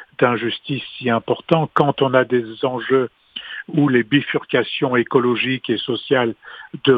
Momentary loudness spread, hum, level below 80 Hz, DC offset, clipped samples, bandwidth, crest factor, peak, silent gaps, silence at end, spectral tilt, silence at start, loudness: 9 LU; none; -62 dBFS; under 0.1%; under 0.1%; 5 kHz; 18 dB; 0 dBFS; none; 0 s; -8.5 dB/octave; 0 s; -19 LUFS